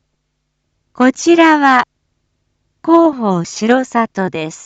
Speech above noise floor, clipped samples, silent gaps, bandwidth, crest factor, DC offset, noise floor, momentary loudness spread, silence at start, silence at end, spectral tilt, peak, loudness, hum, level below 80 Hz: 57 dB; under 0.1%; none; 8 kHz; 14 dB; under 0.1%; -69 dBFS; 11 LU; 1 s; 0 s; -5 dB/octave; 0 dBFS; -12 LUFS; none; -60 dBFS